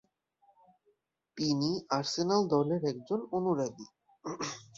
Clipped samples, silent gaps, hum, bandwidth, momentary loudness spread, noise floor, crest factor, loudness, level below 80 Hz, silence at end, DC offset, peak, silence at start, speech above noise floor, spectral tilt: under 0.1%; none; none; 7.8 kHz; 16 LU; -75 dBFS; 20 dB; -32 LUFS; -72 dBFS; 0.15 s; under 0.1%; -14 dBFS; 1.35 s; 43 dB; -5.5 dB/octave